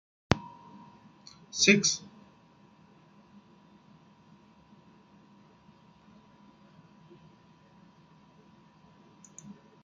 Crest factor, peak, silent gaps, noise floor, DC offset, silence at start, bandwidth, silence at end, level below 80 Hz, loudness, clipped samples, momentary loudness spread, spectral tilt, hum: 34 dB; -2 dBFS; none; -60 dBFS; under 0.1%; 0.3 s; 9.6 kHz; 0.3 s; -60 dBFS; -26 LUFS; under 0.1%; 31 LU; -3 dB/octave; none